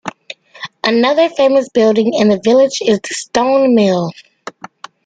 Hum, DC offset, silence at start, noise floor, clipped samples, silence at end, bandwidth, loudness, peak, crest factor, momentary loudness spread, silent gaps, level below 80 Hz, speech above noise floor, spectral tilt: none; under 0.1%; 0.05 s; -36 dBFS; under 0.1%; 0.55 s; 9.4 kHz; -13 LUFS; 0 dBFS; 12 dB; 22 LU; none; -56 dBFS; 24 dB; -5 dB/octave